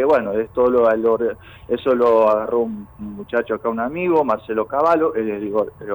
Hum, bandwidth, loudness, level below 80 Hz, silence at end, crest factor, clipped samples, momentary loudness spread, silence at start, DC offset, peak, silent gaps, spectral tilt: none; over 20 kHz; -19 LUFS; -52 dBFS; 0 s; 12 dB; under 0.1%; 10 LU; 0 s; under 0.1%; -6 dBFS; none; -8 dB/octave